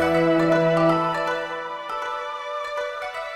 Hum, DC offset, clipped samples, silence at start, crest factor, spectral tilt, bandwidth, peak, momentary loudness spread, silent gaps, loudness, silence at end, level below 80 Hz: none; under 0.1%; under 0.1%; 0 s; 14 dB; -6.5 dB/octave; 13 kHz; -8 dBFS; 11 LU; none; -23 LUFS; 0 s; -56 dBFS